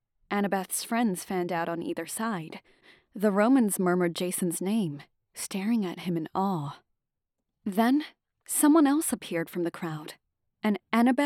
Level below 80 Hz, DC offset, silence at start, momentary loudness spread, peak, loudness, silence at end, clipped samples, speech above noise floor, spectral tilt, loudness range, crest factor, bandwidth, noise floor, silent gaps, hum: -74 dBFS; under 0.1%; 0.3 s; 16 LU; -10 dBFS; -28 LUFS; 0 s; under 0.1%; 57 dB; -5 dB/octave; 4 LU; 18 dB; 19.5 kHz; -84 dBFS; none; none